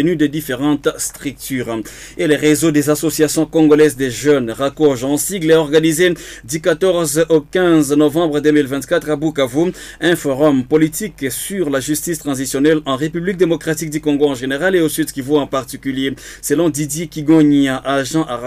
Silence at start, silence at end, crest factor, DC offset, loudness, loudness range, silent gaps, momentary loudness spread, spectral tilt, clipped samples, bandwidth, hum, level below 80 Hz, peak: 0 s; 0 s; 12 dB; under 0.1%; -16 LUFS; 3 LU; none; 9 LU; -5 dB/octave; under 0.1%; 16 kHz; none; -44 dBFS; -2 dBFS